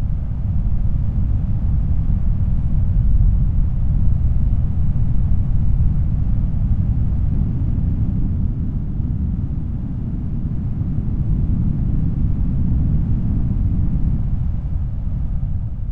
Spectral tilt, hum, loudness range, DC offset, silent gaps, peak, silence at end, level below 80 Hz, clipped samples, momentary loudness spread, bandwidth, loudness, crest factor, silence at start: -12 dB/octave; none; 3 LU; under 0.1%; none; -4 dBFS; 0 s; -20 dBFS; under 0.1%; 5 LU; 2.6 kHz; -21 LUFS; 12 dB; 0 s